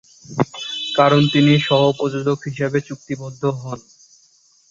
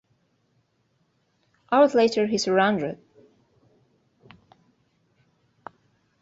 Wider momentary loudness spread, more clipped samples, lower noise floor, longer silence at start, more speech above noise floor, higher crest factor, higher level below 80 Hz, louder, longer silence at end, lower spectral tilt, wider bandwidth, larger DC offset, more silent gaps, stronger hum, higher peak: second, 16 LU vs 28 LU; neither; second, -56 dBFS vs -69 dBFS; second, 0.3 s vs 1.7 s; second, 38 dB vs 49 dB; about the same, 18 dB vs 22 dB; first, -56 dBFS vs -70 dBFS; first, -18 LUFS vs -22 LUFS; second, 0.9 s vs 3.3 s; first, -6 dB/octave vs -4.5 dB/octave; about the same, 7.6 kHz vs 8 kHz; neither; neither; neither; first, -2 dBFS vs -6 dBFS